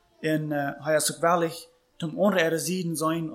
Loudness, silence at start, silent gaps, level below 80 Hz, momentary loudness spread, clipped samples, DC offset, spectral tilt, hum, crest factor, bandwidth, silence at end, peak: -26 LUFS; 0.2 s; none; -70 dBFS; 9 LU; under 0.1%; under 0.1%; -4.5 dB/octave; none; 18 dB; 16.5 kHz; 0 s; -8 dBFS